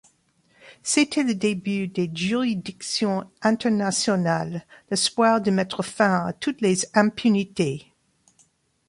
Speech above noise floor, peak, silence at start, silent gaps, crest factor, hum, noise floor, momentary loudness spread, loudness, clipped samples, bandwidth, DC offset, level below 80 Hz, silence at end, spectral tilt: 41 dB; -4 dBFS; 0.65 s; none; 20 dB; none; -63 dBFS; 8 LU; -23 LUFS; under 0.1%; 11.5 kHz; under 0.1%; -64 dBFS; 1.1 s; -4.5 dB/octave